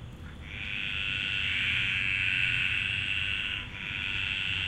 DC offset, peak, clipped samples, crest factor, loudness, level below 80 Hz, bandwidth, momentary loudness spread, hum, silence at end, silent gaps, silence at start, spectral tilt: under 0.1%; -14 dBFS; under 0.1%; 18 dB; -28 LUFS; -48 dBFS; 13.5 kHz; 9 LU; none; 0 s; none; 0 s; -3 dB/octave